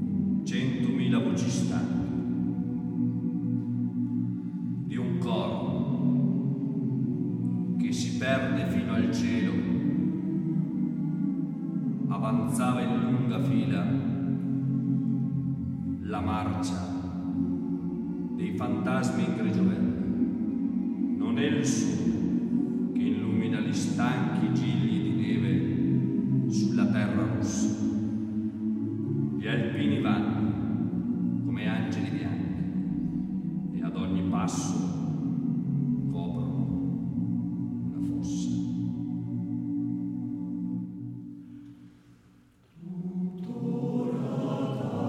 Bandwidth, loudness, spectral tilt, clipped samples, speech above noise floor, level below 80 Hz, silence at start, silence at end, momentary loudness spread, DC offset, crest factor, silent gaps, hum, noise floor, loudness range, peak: 12 kHz; -29 LUFS; -7 dB/octave; under 0.1%; 33 dB; -58 dBFS; 0 s; 0 s; 6 LU; under 0.1%; 16 dB; none; none; -59 dBFS; 5 LU; -12 dBFS